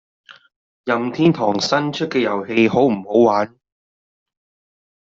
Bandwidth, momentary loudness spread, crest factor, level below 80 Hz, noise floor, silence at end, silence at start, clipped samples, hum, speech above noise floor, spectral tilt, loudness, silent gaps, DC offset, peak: 7.6 kHz; 7 LU; 18 dB; -60 dBFS; under -90 dBFS; 1.7 s; 0.3 s; under 0.1%; none; over 73 dB; -4.5 dB/octave; -18 LUFS; 0.56-0.84 s; under 0.1%; -2 dBFS